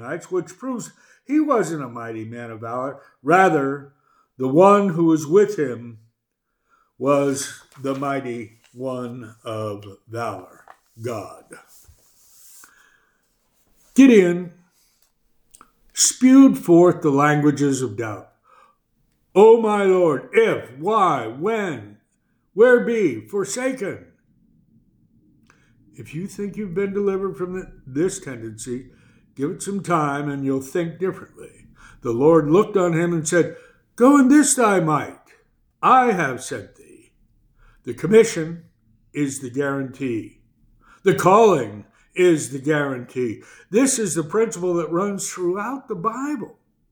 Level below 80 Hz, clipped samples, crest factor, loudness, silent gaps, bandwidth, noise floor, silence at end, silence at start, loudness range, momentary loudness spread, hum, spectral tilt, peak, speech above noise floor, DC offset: -60 dBFS; under 0.1%; 20 dB; -19 LUFS; none; over 20 kHz; -76 dBFS; 0.45 s; 0 s; 12 LU; 18 LU; none; -5 dB/octave; -2 dBFS; 57 dB; under 0.1%